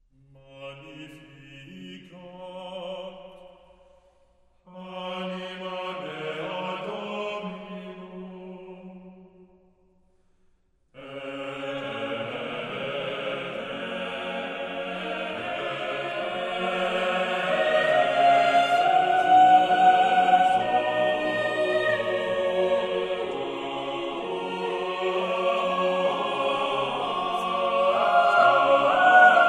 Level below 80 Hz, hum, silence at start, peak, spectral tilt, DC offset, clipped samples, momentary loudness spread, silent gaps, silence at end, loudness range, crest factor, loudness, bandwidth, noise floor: -66 dBFS; none; 0.5 s; -4 dBFS; -4.5 dB/octave; under 0.1%; under 0.1%; 23 LU; none; 0 s; 21 LU; 20 dB; -24 LUFS; 10 kHz; -64 dBFS